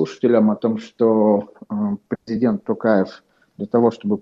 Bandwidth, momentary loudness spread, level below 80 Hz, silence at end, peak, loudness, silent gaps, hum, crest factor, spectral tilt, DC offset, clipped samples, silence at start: 7.2 kHz; 11 LU; -62 dBFS; 0 s; -2 dBFS; -19 LUFS; none; none; 16 dB; -8.5 dB/octave; under 0.1%; under 0.1%; 0 s